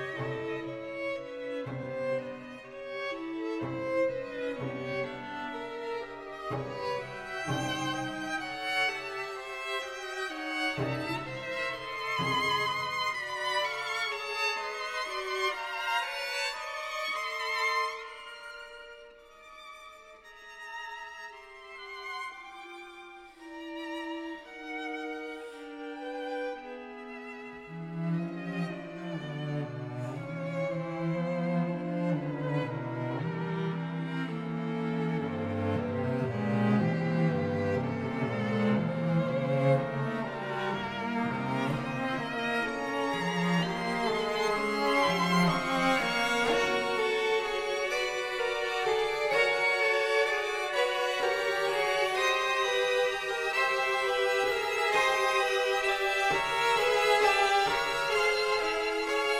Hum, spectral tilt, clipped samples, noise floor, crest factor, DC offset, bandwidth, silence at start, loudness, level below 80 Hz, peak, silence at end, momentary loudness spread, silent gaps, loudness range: none; -5 dB/octave; under 0.1%; -52 dBFS; 18 dB; under 0.1%; 17 kHz; 0 s; -30 LUFS; -62 dBFS; -12 dBFS; 0 s; 15 LU; none; 12 LU